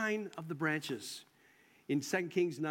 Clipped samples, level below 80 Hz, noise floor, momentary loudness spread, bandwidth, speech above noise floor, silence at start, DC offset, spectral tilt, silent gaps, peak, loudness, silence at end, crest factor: under 0.1%; -86 dBFS; -66 dBFS; 11 LU; 16.5 kHz; 30 dB; 0 s; under 0.1%; -5 dB/octave; none; -20 dBFS; -37 LUFS; 0 s; 18 dB